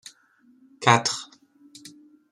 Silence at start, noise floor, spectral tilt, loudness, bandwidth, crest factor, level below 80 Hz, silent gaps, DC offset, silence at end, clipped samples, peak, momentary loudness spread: 0.8 s; -60 dBFS; -3 dB/octave; -22 LUFS; 12.5 kHz; 26 dB; -68 dBFS; none; under 0.1%; 0.45 s; under 0.1%; -2 dBFS; 26 LU